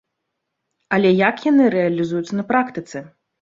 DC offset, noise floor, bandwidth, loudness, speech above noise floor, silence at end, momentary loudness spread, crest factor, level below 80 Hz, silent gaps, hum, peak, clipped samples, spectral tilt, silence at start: under 0.1%; -77 dBFS; 7.6 kHz; -18 LUFS; 60 dB; 0.35 s; 14 LU; 18 dB; -62 dBFS; none; none; -2 dBFS; under 0.1%; -7 dB/octave; 0.9 s